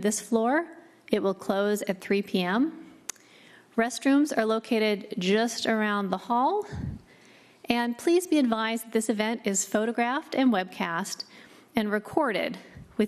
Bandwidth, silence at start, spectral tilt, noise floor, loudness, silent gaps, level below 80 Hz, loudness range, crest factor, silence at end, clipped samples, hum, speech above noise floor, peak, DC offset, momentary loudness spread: 13.5 kHz; 0 s; -4 dB/octave; -55 dBFS; -27 LUFS; none; -58 dBFS; 2 LU; 20 dB; 0 s; under 0.1%; none; 29 dB; -8 dBFS; under 0.1%; 12 LU